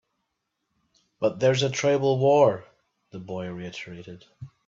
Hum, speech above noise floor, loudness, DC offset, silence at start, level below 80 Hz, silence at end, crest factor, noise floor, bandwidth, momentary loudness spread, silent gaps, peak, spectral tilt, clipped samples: none; 55 dB; -23 LUFS; under 0.1%; 1.2 s; -66 dBFS; 0.2 s; 20 dB; -79 dBFS; 7.8 kHz; 23 LU; none; -6 dBFS; -5.5 dB/octave; under 0.1%